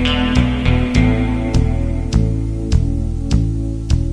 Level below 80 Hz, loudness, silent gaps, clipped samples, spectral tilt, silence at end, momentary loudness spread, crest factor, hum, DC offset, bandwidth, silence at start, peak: -20 dBFS; -17 LUFS; none; under 0.1%; -6.5 dB/octave; 0 s; 6 LU; 16 dB; none; 0.4%; 10.5 kHz; 0 s; 0 dBFS